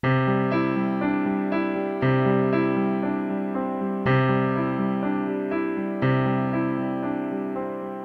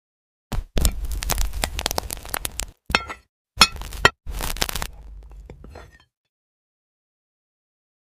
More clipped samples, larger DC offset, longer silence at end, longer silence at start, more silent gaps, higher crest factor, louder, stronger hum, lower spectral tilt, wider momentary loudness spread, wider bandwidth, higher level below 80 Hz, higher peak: neither; neither; second, 0 s vs 2.15 s; second, 0.05 s vs 0.5 s; second, none vs 3.29-3.45 s; second, 14 dB vs 26 dB; about the same, -24 LUFS vs -23 LUFS; neither; first, -10 dB/octave vs -2 dB/octave; second, 6 LU vs 26 LU; second, 5.4 kHz vs 16 kHz; second, -58 dBFS vs -32 dBFS; second, -8 dBFS vs 0 dBFS